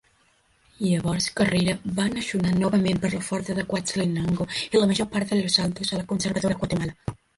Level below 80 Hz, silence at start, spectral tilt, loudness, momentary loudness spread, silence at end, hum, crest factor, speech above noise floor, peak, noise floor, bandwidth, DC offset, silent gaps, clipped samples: -50 dBFS; 0.8 s; -5 dB/octave; -24 LUFS; 6 LU; 0.2 s; none; 20 dB; 39 dB; -6 dBFS; -63 dBFS; 11.5 kHz; under 0.1%; none; under 0.1%